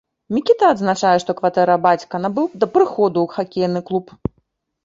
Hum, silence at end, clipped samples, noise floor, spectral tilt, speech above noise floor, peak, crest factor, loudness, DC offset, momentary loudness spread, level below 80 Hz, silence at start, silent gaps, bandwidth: none; 0.85 s; under 0.1%; -66 dBFS; -6 dB/octave; 49 dB; -2 dBFS; 16 dB; -18 LUFS; under 0.1%; 9 LU; -50 dBFS; 0.3 s; none; 7.8 kHz